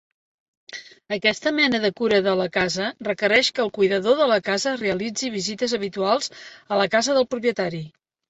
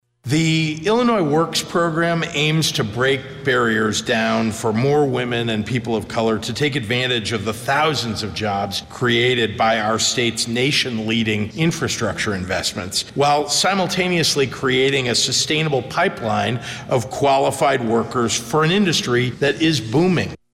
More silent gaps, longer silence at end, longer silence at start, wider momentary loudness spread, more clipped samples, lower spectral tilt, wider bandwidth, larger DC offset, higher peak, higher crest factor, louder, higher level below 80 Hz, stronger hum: neither; first, 0.4 s vs 0.2 s; first, 0.7 s vs 0.25 s; first, 12 LU vs 6 LU; neither; about the same, -3.5 dB/octave vs -4 dB/octave; second, 8.4 kHz vs 16 kHz; neither; about the same, -6 dBFS vs -8 dBFS; about the same, 16 dB vs 12 dB; second, -22 LUFS vs -19 LUFS; second, -62 dBFS vs -50 dBFS; neither